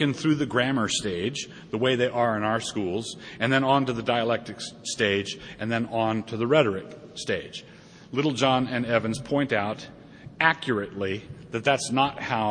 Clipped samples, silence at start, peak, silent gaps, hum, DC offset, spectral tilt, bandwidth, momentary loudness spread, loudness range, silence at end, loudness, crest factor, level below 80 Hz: under 0.1%; 0 s; -4 dBFS; none; none; under 0.1%; -4.5 dB/octave; 10 kHz; 12 LU; 2 LU; 0 s; -26 LUFS; 22 dB; -60 dBFS